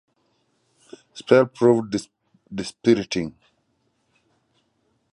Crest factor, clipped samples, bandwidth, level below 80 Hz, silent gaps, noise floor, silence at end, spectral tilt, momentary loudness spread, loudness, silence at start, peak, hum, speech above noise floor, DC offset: 22 dB; under 0.1%; 11.5 kHz; -60 dBFS; none; -69 dBFS; 1.85 s; -6 dB/octave; 17 LU; -21 LUFS; 1.15 s; -2 dBFS; none; 49 dB; under 0.1%